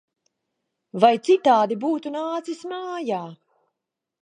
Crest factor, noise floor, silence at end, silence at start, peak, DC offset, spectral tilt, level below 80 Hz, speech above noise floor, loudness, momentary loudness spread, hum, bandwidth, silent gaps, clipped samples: 22 dB; -84 dBFS; 0.9 s; 0.95 s; -2 dBFS; under 0.1%; -5.5 dB/octave; -82 dBFS; 63 dB; -22 LUFS; 14 LU; none; 10 kHz; none; under 0.1%